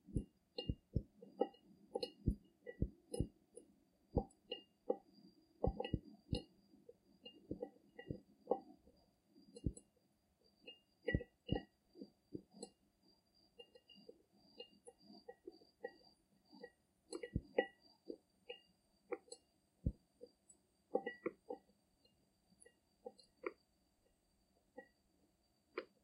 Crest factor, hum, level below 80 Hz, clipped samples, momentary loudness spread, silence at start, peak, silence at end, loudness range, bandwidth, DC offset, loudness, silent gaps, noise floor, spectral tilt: 28 dB; none; -58 dBFS; under 0.1%; 22 LU; 0.05 s; -20 dBFS; 0.2 s; 13 LU; 11.5 kHz; under 0.1%; -48 LUFS; none; -79 dBFS; -6.5 dB/octave